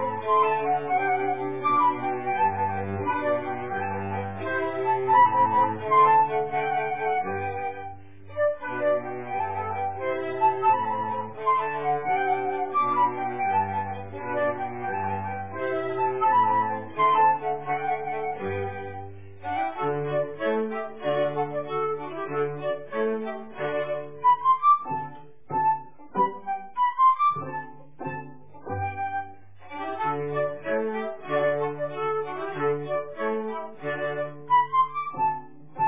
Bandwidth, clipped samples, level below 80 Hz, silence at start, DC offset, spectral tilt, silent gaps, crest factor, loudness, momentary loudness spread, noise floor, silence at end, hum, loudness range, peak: 3.8 kHz; under 0.1%; -60 dBFS; 0 s; 0.6%; -4.5 dB/octave; none; 16 dB; -26 LUFS; 13 LU; -46 dBFS; 0 s; none; 6 LU; -10 dBFS